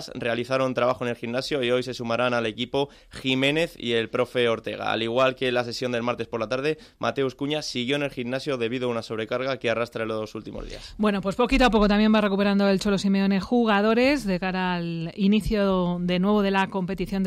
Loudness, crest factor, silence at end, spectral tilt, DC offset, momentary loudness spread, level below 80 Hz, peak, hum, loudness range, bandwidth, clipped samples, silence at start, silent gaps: -24 LUFS; 14 dB; 0 s; -6 dB/octave; under 0.1%; 9 LU; -44 dBFS; -10 dBFS; none; 6 LU; 14 kHz; under 0.1%; 0 s; none